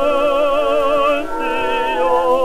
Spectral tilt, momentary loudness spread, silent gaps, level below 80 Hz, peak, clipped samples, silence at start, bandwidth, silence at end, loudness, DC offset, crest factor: -4 dB/octave; 4 LU; none; -40 dBFS; -4 dBFS; under 0.1%; 0 s; 15 kHz; 0 s; -16 LUFS; under 0.1%; 12 dB